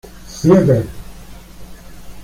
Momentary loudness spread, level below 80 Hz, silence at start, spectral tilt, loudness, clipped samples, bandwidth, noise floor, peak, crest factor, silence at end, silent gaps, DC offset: 23 LU; -38 dBFS; 0.15 s; -8 dB/octave; -14 LUFS; under 0.1%; 16 kHz; -35 dBFS; -2 dBFS; 16 dB; 0 s; none; under 0.1%